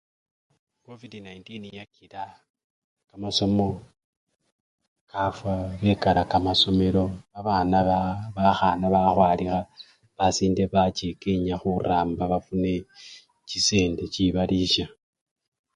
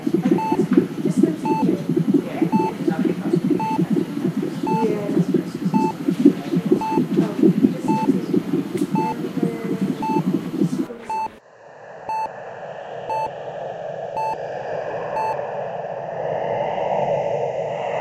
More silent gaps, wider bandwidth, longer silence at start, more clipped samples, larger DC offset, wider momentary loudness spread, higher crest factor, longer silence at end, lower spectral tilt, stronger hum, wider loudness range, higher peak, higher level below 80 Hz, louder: first, 2.50-2.54 s, 2.64-2.97 s, 4.04-4.27 s, 4.52-4.78 s, 4.88-5.07 s vs none; second, 10.5 kHz vs 15.5 kHz; first, 0.9 s vs 0 s; neither; neither; first, 20 LU vs 10 LU; about the same, 20 dB vs 22 dB; first, 0.9 s vs 0 s; second, -5 dB/octave vs -8 dB/octave; neither; about the same, 8 LU vs 8 LU; second, -4 dBFS vs 0 dBFS; first, -44 dBFS vs -62 dBFS; about the same, -24 LUFS vs -22 LUFS